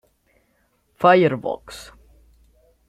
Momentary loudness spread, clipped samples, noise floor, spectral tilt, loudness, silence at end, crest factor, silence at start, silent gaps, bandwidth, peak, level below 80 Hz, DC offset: 24 LU; under 0.1%; -65 dBFS; -6.5 dB/octave; -19 LUFS; 1.05 s; 22 dB; 1 s; none; 13.5 kHz; -2 dBFS; -56 dBFS; under 0.1%